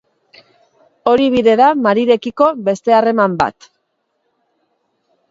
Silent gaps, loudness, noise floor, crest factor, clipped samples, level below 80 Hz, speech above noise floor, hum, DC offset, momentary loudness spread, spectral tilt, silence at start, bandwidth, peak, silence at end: none; -13 LUFS; -68 dBFS; 16 dB; under 0.1%; -54 dBFS; 55 dB; none; under 0.1%; 7 LU; -6 dB/octave; 1.05 s; 7.8 kHz; 0 dBFS; 1.8 s